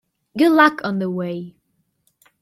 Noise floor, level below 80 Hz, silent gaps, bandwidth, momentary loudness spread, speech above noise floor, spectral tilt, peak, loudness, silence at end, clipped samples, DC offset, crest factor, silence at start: -68 dBFS; -66 dBFS; none; 15 kHz; 20 LU; 51 dB; -6.5 dB/octave; -2 dBFS; -18 LUFS; 0.9 s; under 0.1%; under 0.1%; 20 dB; 0.35 s